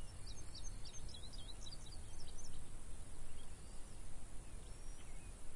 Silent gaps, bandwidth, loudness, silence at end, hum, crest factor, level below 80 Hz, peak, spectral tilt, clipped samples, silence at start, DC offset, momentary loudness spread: none; 11.5 kHz; -55 LUFS; 0 s; none; 10 dB; -50 dBFS; -32 dBFS; -3.5 dB/octave; under 0.1%; 0 s; under 0.1%; 4 LU